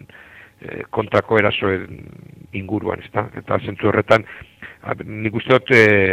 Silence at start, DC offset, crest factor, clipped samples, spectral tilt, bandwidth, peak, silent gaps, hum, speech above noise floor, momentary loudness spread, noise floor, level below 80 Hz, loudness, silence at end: 0.65 s; under 0.1%; 20 dB; under 0.1%; -6.5 dB/octave; 13 kHz; 0 dBFS; none; none; 25 dB; 22 LU; -44 dBFS; -52 dBFS; -18 LUFS; 0 s